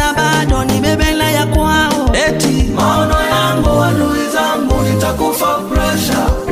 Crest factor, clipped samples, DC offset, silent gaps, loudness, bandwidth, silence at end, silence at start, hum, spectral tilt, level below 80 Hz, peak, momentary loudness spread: 12 dB; under 0.1%; under 0.1%; none; -13 LUFS; 16 kHz; 0 s; 0 s; none; -5 dB/octave; -20 dBFS; 0 dBFS; 2 LU